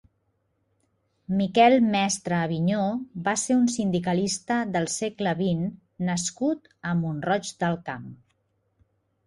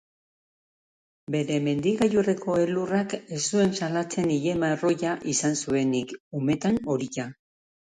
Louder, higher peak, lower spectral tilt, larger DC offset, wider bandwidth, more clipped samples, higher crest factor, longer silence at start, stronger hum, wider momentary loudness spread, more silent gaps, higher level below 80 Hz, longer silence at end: about the same, -25 LUFS vs -26 LUFS; first, -6 dBFS vs -10 dBFS; about the same, -5 dB/octave vs -5 dB/octave; neither; about the same, 11.5 kHz vs 11 kHz; neither; about the same, 20 dB vs 16 dB; about the same, 1.3 s vs 1.3 s; neither; first, 10 LU vs 7 LU; second, none vs 6.20-6.31 s; about the same, -62 dBFS vs -60 dBFS; first, 1.1 s vs 0.65 s